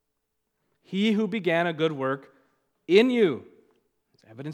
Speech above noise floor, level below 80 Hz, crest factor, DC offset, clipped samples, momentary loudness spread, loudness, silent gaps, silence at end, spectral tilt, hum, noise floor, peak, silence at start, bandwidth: 56 dB; -82 dBFS; 22 dB; under 0.1%; under 0.1%; 14 LU; -24 LUFS; none; 0 s; -6.5 dB/octave; none; -79 dBFS; -6 dBFS; 0.9 s; 11 kHz